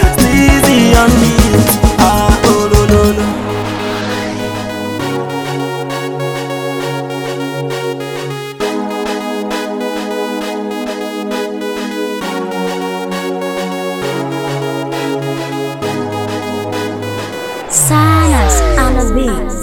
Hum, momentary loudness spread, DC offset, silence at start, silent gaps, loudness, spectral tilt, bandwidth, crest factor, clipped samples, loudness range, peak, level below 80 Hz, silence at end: none; 11 LU; under 0.1%; 0 s; none; -14 LUFS; -5 dB/octave; 20 kHz; 14 dB; 0.2%; 9 LU; 0 dBFS; -22 dBFS; 0 s